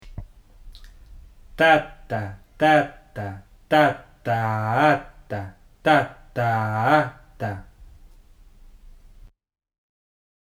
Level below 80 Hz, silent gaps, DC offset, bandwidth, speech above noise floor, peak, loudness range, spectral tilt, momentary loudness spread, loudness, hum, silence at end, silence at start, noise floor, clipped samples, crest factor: -48 dBFS; none; under 0.1%; 16 kHz; 29 dB; -4 dBFS; 6 LU; -6.5 dB/octave; 17 LU; -22 LUFS; none; 2.6 s; 0.05 s; -49 dBFS; under 0.1%; 20 dB